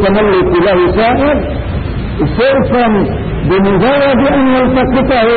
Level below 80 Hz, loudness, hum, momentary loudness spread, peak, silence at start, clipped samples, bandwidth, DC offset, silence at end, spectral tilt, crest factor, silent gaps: -24 dBFS; -11 LUFS; none; 7 LU; -2 dBFS; 0 s; under 0.1%; 4.7 kHz; under 0.1%; 0 s; -13 dB/octave; 8 dB; none